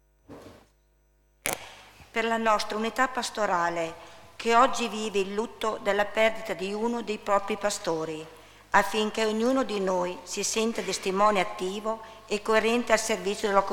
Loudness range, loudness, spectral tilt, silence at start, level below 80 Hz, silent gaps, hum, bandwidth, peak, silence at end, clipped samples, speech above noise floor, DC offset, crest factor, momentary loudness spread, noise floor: 2 LU; -27 LUFS; -3 dB/octave; 0.3 s; -58 dBFS; none; 50 Hz at -60 dBFS; 19 kHz; -4 dBFS; 0 s; under 0.1%; 38 dB; under 0.1%; 24 dB; 10 LU; -65 dBFS